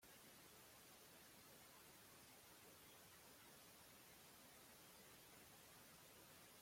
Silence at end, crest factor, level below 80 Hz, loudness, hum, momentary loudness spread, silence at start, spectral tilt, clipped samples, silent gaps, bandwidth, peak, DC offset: 0 s; 14 dB; -86 dBFS; -64 LUFS; none; 0 LU; 0 s; -2 dB/octave; under 0.1%; none; 16.5 kHz; -52 dBFS; under 0.1%